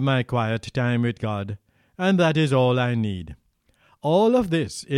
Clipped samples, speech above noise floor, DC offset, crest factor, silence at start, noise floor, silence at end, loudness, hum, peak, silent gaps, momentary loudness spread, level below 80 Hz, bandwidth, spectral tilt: under 0.1%; 41 dB; under 0.1%; 14 dB; 0 s; -63 dBFS; 0 s; -22 LUFS; none; -8 dBFS; none; 11 LU; -52 dBFS; 12 kHz; -6.5 dB/octave